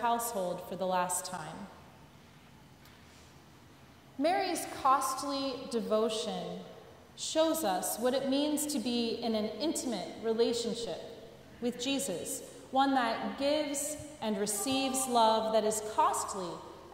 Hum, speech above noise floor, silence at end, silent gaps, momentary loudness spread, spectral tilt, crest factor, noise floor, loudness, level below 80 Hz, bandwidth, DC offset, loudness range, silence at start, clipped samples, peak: none; 24 dB; 0 s; none; 13 LU; -3 dB/octave; 20 dB; -57 dBFS; -32 LUFS; -68 dBFS; 16 kHz; under 0.1%; 8 LU; 0 s; under 0.1%; -14 dBFS